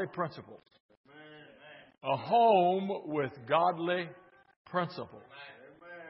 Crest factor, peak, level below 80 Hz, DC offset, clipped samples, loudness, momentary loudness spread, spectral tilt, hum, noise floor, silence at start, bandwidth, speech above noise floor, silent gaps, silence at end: 20 dB; -12 dBFS; -80 dBFS; under 0.1%; under 0.1%; -30 LUFS; 26 LU; -9.5 dB/octave; none; -55 dBFS; 0 s; 5.8 kHz; 24 dB; 0.80-0.89 s, 0.97-1.04 s, 4.56-4.65 s; 0 s